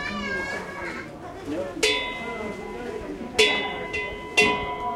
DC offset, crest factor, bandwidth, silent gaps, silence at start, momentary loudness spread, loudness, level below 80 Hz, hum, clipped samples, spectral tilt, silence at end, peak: under 0.1%; 24 dB; 16 kHz; none; 0 s; 14 LU; -25 LUFS; -48 dBFS; none; under 0.1%; -2.5 dB/octave; 0 s; -2 dBFS